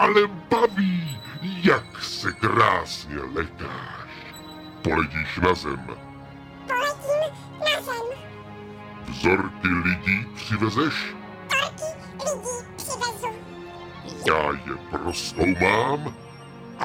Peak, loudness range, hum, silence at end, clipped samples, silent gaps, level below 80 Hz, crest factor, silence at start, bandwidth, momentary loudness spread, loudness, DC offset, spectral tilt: -4 dBFS; 4 LU; none; 0 s; under 0.1%; none; -48 dBFS; 22 dB; 0 s; 16.5 kHz; 19 LU; -24 LUFS; under 0.1%; -4.5 dB/octave